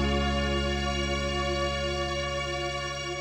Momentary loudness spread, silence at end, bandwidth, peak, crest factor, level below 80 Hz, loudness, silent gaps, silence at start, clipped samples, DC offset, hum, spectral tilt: 4 LU; 0 s; 12 kHz; -14 dBFS; 14 dB; -36 dBFS; -29 LUFS; none; 0 s; under 0.1%; under 0.1%; none; -4.5 dB/octave